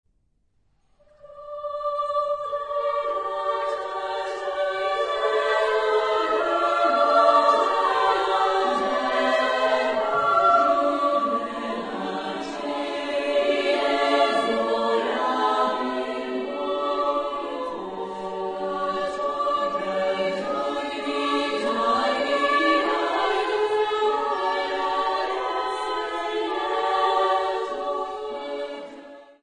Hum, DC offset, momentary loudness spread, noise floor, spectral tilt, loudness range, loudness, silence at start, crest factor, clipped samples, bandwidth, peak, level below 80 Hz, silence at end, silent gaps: none; under 0.1%; 10 LU; -66 dBFS; -3.5 dB/octave; 7 LU; -23 LUFS; 1.25 s; 18 dB; under 0.1%; 10 kHz; -6 dBFS; -62 dBFS; 0.2 s; none